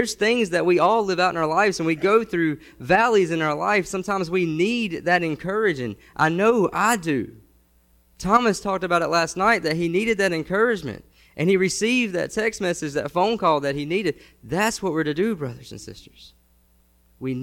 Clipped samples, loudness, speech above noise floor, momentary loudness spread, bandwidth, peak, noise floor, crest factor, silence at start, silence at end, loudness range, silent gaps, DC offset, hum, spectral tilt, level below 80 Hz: under 0.1%; -22 LUFS; 38 dB; 11 LU; 16.5 kHz; -4 dBFS; -59 dBFS; 18 dB; 0 s; 0 s; 4 LU; none; under 0.1%; none; -4.5 dB/octave; -54 dBFS